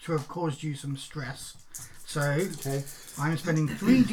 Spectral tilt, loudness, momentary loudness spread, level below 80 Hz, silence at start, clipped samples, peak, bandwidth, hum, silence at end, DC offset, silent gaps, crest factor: -6 dB/octave; -30 LUFS; 15 LU; -54 dBFS; 0 s; under 0.1%; -10 dBFS; 18.5 kHz; none; 0 s; under 0.1%; none; 20 dB